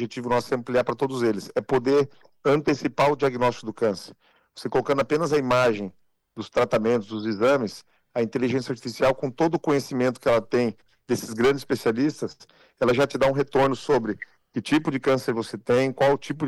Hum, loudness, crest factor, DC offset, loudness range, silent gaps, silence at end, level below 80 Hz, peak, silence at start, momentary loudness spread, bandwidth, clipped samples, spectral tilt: none; -24 LUFS; 10 dB; under 0.1%; 1 LU; none; 0 s; -56 dBFS; -14 dBFS; 0 s; 9 LU; 15 kHz; under 0.1%; -6 dB/octave